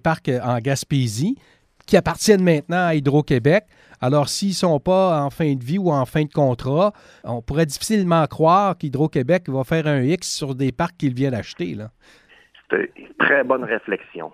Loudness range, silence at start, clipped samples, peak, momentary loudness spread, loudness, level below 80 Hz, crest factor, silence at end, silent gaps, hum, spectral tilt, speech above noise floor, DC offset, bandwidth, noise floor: 4 LU; 0.05 s; under 0.1%; 0 dBFS; 9 LU; -20 LUFS; -48 dBFS; 20 dB; 0.05 s; none; none; -6 dB/octave; 33 dB; under 0.1%; 15.5 kHz; -52 dBFS